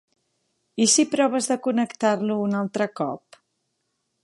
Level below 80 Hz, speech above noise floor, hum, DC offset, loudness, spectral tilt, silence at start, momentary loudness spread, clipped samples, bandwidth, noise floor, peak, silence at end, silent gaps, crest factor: -76 dBFS; 53 dB; none; under 0.1%; -22 LUFS; -3.5 dB/octave; 0.75 s; 12 LU; under 0.1%; 11.5 kHz; -75 dBFS; -6 dBFS; 1.05 s; none; 18 dB